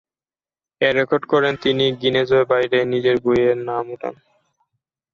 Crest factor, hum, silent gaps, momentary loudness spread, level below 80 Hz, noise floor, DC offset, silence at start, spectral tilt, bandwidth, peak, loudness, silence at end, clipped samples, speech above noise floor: 16 dB; none; none; 9 LU; -56 dBFS; under -90 dBFS; under 0.1%; 0.8 s; -6.5 dB/octave; 7 kHz; -4 dBFS; -18 LUFS; 1 s; under 0.1%; over 72 dB